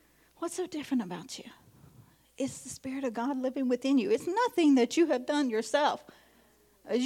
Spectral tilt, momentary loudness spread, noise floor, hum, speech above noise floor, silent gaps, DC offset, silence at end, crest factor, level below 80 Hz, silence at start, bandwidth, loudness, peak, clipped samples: -4 dB/octave; 15 LU; -64 dBFS; none; 34 dB; none; under 0.1%; 0 s; 16 dB; -74 dBFS; 0.4 s; 15.5 kHz; -30 LUFS; -14 dBFS; under 0.1%